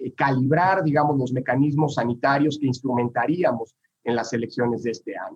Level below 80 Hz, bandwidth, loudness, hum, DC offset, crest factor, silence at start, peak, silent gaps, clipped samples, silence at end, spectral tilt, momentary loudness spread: -68 dBFS; 8 kHz; -23 LUFS; none; under 0.1%; 14 dB; 0 s; -8 dBFS; none; under 0.1%; 0 s; -7 dB/octave; 9 LU